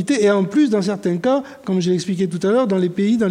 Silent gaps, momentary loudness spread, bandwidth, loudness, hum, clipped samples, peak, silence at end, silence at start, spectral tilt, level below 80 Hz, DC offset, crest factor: none; 5 LU; 11 kHz; -18 LUFS; none; under 0.1%; -4 dBFS; 0 s; 0 s; -6.5 dB/octave; -62 dBFS; under 0.1%; 12 dB